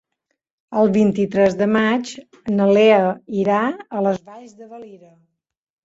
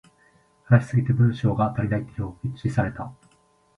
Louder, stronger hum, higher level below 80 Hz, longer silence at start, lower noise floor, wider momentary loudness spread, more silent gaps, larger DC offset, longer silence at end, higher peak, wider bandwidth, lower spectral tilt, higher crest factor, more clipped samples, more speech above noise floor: first, -18 LUFS vs -24 LUFS; neither; second, -60 dBFS vs -48 dBFS; about the same, 0.7 s vs 0.7 s; first, -75 dBFS vs -62 dBFS; first, 18 LU vs 12 LU; neither; neither; first, 0.9 s vs 0.65 s; about the same, -2 dBFS vs -4 dBFS; first, 8 kHz vs 7.2 kHz; second, -6.5 dB/octave vs -9 dB/octave; about the same, 16 dB vs 20 dB; neither; first, 57 dB vs 39 dB